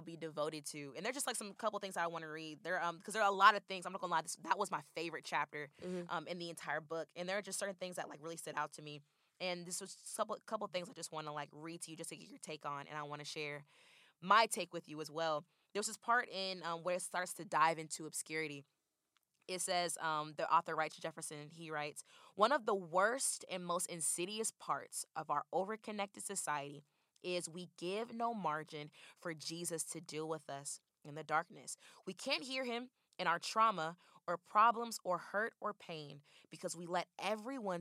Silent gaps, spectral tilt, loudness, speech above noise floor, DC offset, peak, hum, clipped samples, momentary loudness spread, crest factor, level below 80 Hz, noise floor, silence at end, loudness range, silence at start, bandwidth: none; -2.5 dB/octave; -40 LUFS; 43 dB; under 0.1%; -14 dBFS; none; under 0.1%; 14 LU; 28 dB; under -90 dBFS; -84 dBFS; 0 s; 7 LU; 0 s; 15.5 kHz